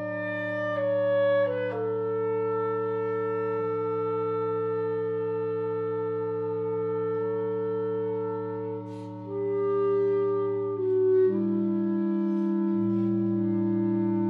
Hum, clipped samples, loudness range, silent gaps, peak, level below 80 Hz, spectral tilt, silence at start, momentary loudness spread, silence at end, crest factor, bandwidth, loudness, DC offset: none; under 0.1%; 4 LU; none; -16 dBFS; -76 dBFS; -10.5 dB/octave; 0 s; 6 LU; 0 s; 10 dB; 4.7 kHz; -28 LUFS; under 0.1%